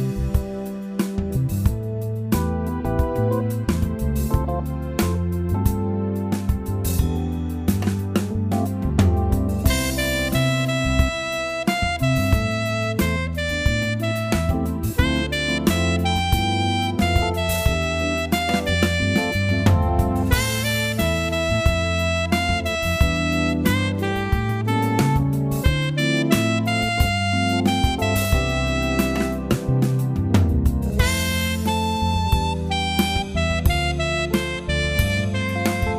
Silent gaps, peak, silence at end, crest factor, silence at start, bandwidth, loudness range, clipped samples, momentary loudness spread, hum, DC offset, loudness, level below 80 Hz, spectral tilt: none; -2 dBFS; 0 s; 18 dB; 0 s; 15.5 kHz; 3 LU; under 0.1%; 4 LU; none; under 0.1%; -21 LUFS; -28 dBFS; -5.5 dB/octave